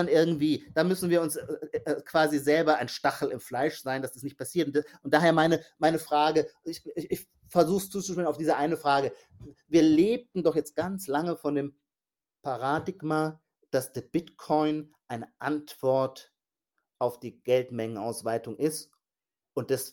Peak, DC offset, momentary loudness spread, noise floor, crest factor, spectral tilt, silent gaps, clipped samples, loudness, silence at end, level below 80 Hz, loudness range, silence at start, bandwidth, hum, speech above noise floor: -8 dBFS; under 0.1%; 12 LU; under -90 dBFS; 20 dB; -5.5 dB/octave; none; under 0.1%; -28 LUFS; 0 s; -66 dBFS; 5 LU; 0 s; 17 kHz; none; over 62 dB